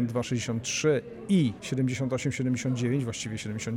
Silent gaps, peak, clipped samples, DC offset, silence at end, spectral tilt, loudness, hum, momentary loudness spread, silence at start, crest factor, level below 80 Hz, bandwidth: none; -14 dBFS; under 0.1%; under 0.1%; 0 s; -5.5 dB/octave; -29 LUFS; none; 6 LU; 0 s; 14 dB; -58 dBFS; 15.5 kHz